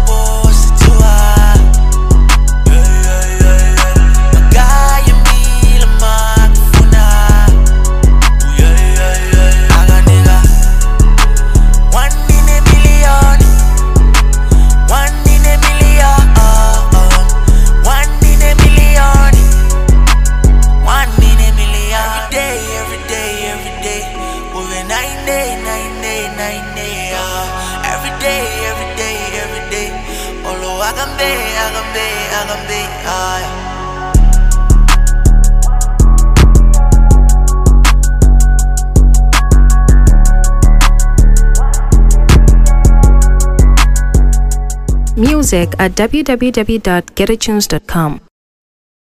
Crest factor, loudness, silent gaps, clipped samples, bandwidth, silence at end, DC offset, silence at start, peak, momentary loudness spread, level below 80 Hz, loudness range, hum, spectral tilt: 6 dB; -11 LUFS; none; 0.5%; 15.5 kHz; 0.9 s; under 0.1%; 0 s; 0 dBFS; 10 LU; -8 dBFS; 8 LU; none; -4.5 dB/octave